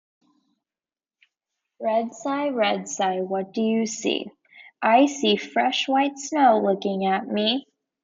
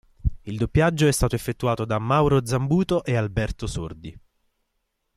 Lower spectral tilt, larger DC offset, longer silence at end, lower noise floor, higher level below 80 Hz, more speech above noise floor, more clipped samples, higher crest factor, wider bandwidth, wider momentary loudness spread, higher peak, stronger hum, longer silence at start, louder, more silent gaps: second, -4 dB/octave vs -6 dB/octave; neither; second, 0.45 s vs 1 s; first, under -90 dBFS vs -75 dBFS; second, -76 dBFS vs -36 dBFS; first, over 68 dB vs 53 dB; neither; about the same, 18 dB vs 16 dB; second, 7.8 kHz vs 15 kHz; about the same, 9 LU vs 11 LU; about the same, -6 dBFS vs -8 dBFS; neither; first, 1.8 s vs 0.25 s; about the same, -23 LUFS vs -23 LUFS; neither